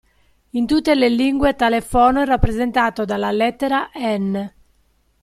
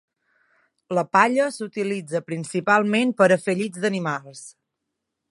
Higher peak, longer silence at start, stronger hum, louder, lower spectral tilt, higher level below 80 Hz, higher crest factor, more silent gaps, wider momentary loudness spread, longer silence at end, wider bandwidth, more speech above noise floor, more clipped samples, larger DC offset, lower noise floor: about the same, -2 dBFS vs -2 dBFS; second, 0.55 s vs 0.9 s; neither; first, -18 LUFS vs -22 LUFS; about the same, -6 dB/octave vs -5.5 dB/octave; first, -32 dBFS vs -74 dBFS; second, 16 dB vs 22 dB; neither; about the same, 8 LU vs 10 LU; about the same, 0.75 s vs 0.8 s; first, 14.5 kHz vs 11.5 kHz; second, 43 dB vs 59 dB; neither; neither; second, -60 dBFS vs -81 dBFS